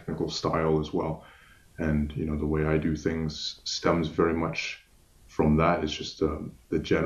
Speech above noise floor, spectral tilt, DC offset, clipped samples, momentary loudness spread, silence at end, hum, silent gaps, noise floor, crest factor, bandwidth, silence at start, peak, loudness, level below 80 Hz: 29 dB; -6 dB/octave; under 0.1%; under 0.1%; 8 LU; 0 s; none; none; -56 dBFS; 20 dB; 11.5 kHz; 0 s; -8 dBFS; -28 LUFS; -42 dBFS